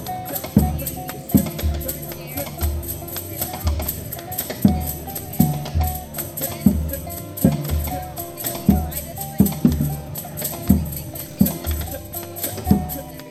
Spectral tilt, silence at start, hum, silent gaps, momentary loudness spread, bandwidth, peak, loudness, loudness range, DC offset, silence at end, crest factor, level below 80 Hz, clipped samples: -6 dB/octave; 0 s; none; none; 10 LU; over 20 kHz; 0 dBFS; -23 LUFS; 3 LU; under 0.1%; 0 s; 22 dB; -30 dBFS; under 0.1%